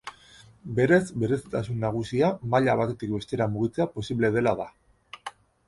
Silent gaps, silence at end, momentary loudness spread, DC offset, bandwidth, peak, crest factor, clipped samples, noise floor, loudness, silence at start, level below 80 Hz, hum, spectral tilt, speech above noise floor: none; 0.35 s; 19 LU; under 0.1%; 11.5 kHz; -6 dBFS; 20 dB; under 0.1%; -53 dBFS; -26 LUFS; 0.05 s; -54 dBFS; none; -7 dB/octave; 28 dB